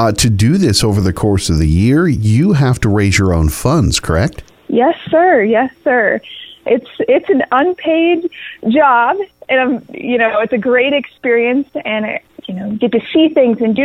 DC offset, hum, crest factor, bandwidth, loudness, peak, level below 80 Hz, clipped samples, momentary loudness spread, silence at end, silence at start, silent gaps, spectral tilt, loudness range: under 0.1%; none; 12 dB; 15.5 kHz; -13 LUFS; 0 dBFS; -30 dBFS; under 0.1%; 8 LU; 0 s; 0 s; none; -5.5 dB/octave; 2 LU